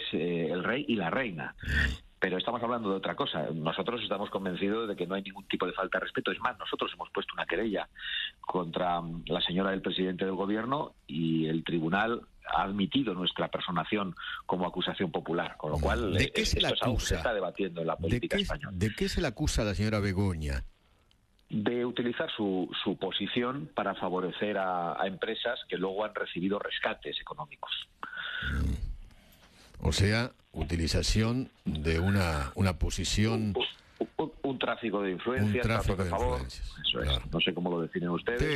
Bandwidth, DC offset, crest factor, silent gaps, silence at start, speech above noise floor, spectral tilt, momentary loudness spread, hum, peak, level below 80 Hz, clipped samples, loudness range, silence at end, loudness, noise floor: 13 kHz; under 0.1%; 18 dB; none; 0 s; 35 dB; -5 dB/octave; 7 LU; none; -12 dBFS; -42 dBFS; under 0.1%; 3 LU; 0 s; -32 LUFS; -66 dBFS